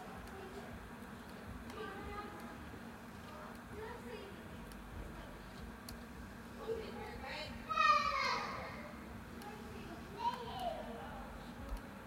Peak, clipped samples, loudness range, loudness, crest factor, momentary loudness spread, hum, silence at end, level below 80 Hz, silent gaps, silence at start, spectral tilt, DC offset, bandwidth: -20 dBFS; under 0.1%; 12 LU; -43 LUFS; 24 dB; 15 LU; none; 0 s; -56 dBFS; none; 0 s; -4.5 dB/octave; under 0.1%; 16 kHz